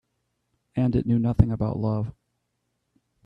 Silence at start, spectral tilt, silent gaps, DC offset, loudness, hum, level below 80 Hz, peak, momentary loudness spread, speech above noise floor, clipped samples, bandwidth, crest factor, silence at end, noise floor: 0.75 s; -11 dB/octave; none; under 0.1%; -25 LUFS; none; -40 dBFS; -2 dBFS; 9 LU; 54 dB; under 0.1%; 5.2 kHz; 24 dB; 1.15 s; -77 dBFS